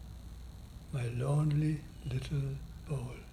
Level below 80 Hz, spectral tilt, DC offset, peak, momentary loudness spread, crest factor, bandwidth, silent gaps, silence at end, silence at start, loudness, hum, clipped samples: -50 dBFS; -7.5 dB/octave; under 0.1%; -22 dBFS; 19 LU; 14 dB; 13 kHz; none; 0 s; 0 s; -36 LUFS; none; under 0.1%